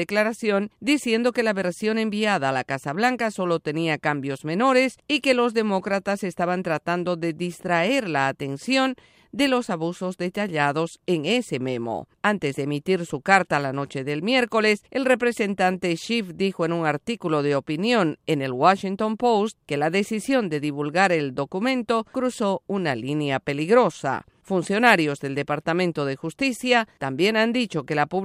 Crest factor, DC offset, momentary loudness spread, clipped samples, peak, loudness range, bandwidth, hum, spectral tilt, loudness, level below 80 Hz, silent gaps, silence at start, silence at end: 22 dB; under 0.1%; 8 LU; under 0.1%; -2 dBFS; 2 LU; 15.5 kHz; none; -5 dB/octave; -23 LUFS; -64 dBFS; none; 0 s; 0 s